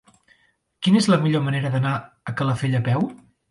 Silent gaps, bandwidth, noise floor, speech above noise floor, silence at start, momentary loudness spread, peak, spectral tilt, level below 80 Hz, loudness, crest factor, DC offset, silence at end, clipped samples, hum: none; 11.5 kHz; -64 dBFS; 43 dB; 0.8 s; 10 LU; -6 dBFS; -6.5 dB/octave; -58 dBFS; -22 LUFS; 16 dB; under 0.1%; 0.35 s; under 0.1%; none